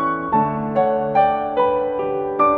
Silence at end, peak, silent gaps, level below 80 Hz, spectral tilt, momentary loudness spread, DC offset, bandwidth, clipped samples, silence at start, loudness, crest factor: 0 s; -4 dBFS; none; -50 dBFS; -9.5 dB/octave; 5 LU; under 0.1%; 4.8 kHz; under 0.1%; 0 s; -19 LUFS; 14 dB